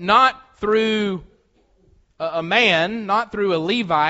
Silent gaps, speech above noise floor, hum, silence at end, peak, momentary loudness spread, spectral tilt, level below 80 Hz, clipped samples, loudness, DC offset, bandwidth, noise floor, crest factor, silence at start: none; 41 dB; none; 0 s; -2 dBFS; 11 LU; -2 dB/octave; -54 dBFS; under 0.1%; -19 LUFS; under 0.1%; 8 kHz; -59 dBFS; 18 dB; 0 s